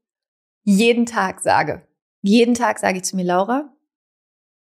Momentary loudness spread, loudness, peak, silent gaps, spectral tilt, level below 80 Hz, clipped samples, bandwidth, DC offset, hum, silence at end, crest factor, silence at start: 11 LU; -18 LUFS; -4 dBFS; 2.02-2.22 s; -5 dB/octave; -62 dBFS; under 0.1%; 15 kHz; under 0.1%; none; 1.05 s; 16 dB; 0.65 s